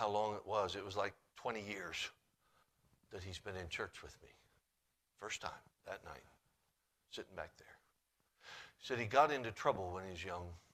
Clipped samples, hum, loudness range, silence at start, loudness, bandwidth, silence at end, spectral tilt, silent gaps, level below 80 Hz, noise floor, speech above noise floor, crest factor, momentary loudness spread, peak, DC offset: under 0.1%; none; 12 LU; 0 s; -42 LUFS; 14.5 kHz; 0.15 s; -4 dB/octave; none; -72 dBFS; -84 dBFS; 42 dB; 26 dB; 19 LU; -18 dBFS; under 0.1%